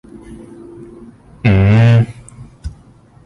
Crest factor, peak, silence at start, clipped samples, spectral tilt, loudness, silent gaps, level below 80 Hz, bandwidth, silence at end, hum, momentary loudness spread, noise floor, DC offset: 14 dB; -2 dBFS; 0.15 s; under 0.1%; -8.5 dB/octave; -12 LUFS; none; -32 dBFS; 9.4 kHz; 0.55 s; none; 26 LU; -44 dBFS; under 0.1%